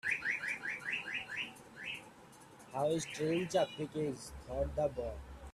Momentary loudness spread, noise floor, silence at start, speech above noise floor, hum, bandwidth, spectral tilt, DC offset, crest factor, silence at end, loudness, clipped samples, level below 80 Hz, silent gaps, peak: 12 LU; -58 dBFS; 0.05 s; 21 dB; none; 14.5 kHz; -4.5 dB/octave; under 0.1%; 18 dB; 0 s; -38 LUFS; under 0.1%; -56 dBFS; none; -20 dBFS